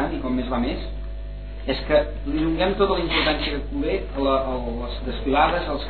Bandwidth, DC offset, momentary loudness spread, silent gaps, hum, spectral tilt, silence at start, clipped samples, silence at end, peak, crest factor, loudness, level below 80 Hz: 4.6 kHz; 0.6%; 12 LU; none; 50 Hz at -30 dBFS; -8.5 dB/octave; 0 s; under 0.1%; 0 s; -6 dBFS; 18 dB; -23 LUFS; -32 dBFS